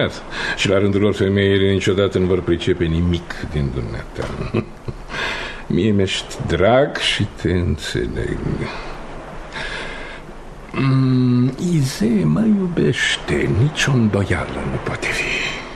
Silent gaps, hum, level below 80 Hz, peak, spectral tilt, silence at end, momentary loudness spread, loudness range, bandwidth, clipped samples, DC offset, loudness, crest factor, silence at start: none; none; -34 dBFS; -2 dBFS; -6 dB/octave; 0 s; 13 LU; 6 LU; 13 kHz; under 0.1%; under 0.1%; -19 LUFS; 16 dB; 0 s